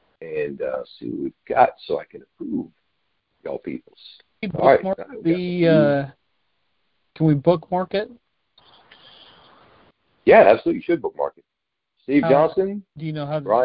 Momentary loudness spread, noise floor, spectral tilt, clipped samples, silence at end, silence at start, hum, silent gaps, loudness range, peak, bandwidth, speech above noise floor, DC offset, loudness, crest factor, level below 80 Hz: 16 LU; -79 dBFS; -11.5 dB/octave; under 0.1%; 0 s; 0.2 s; none; none; 7 LU; 0 dBFS; 5.2 kHz; 60 dB; under 0.1%; -20 LUFS; 20 dB; -58 dBFS